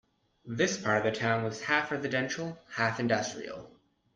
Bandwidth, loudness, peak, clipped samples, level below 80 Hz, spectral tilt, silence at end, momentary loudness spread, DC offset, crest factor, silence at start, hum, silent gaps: 9.8 kHz; -30 LUFS; -12 dBFS; under 0.1%; -68 dBFS; -4.5 dB/octave; 0.45 s; 12 LU; under 0.1%; 20 dB; 0.45 s; none; none